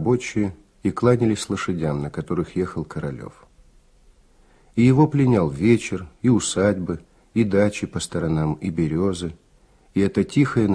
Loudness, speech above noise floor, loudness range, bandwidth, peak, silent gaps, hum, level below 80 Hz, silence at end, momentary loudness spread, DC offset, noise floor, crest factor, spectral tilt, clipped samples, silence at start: -22 LUFS; 35 dB; 6 LU; 11 kHz; -4 dBFS; none; none; -46 dBFS; 0 s; 12 LU; under 0.1%; -55 dBFS; 18 dB; -6.5 dB/octave; under 0.1%; 0 s